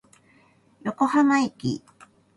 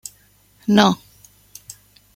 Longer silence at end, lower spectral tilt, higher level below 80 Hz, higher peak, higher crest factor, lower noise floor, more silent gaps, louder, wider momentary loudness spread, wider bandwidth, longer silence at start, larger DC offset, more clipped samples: second, 0.6 s vs 1.2 s; about the same, -5.5 dB/octave vs -5 dB/octave; second, -64 dBFS vs -56 dBFS; second, -8 dBFS vs 0 dBFS; about the same, 18 dB vs 22 dB; first, -59 dBFS vs -55 dBFS; neither; second, -24 LUFS vs -18 LUFS; second, 15 LU vs 25 LU; second, 11.5 kHz vs 16.5 kHz; first, 0.85 s vs 0.7 s; neither; neither